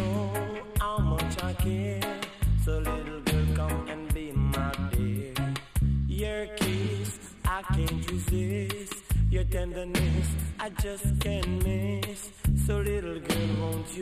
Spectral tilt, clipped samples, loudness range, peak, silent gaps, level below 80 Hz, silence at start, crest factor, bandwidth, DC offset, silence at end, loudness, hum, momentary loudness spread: -5.5 dB/octave; under 0.1%; 1 LU; -14 dBFS; none; -32 dBFS; 0 s; 16 dB; 15.5 kHz; under 0.1%; 0 s; -30 LUFS; none; 5 LU